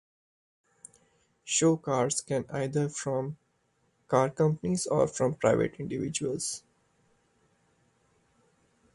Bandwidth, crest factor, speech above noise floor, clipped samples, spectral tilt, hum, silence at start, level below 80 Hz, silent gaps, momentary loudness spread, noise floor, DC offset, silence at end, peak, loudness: 11.5 kHz; 20 dB; 44 dB; under 0.1%; -5 dB/octave; none; 1.45 s; -64 dBFS; none; 9 LU; -72 dBFS; under 0.1%; 2.35 s; -10 dBFS; -29 LUFS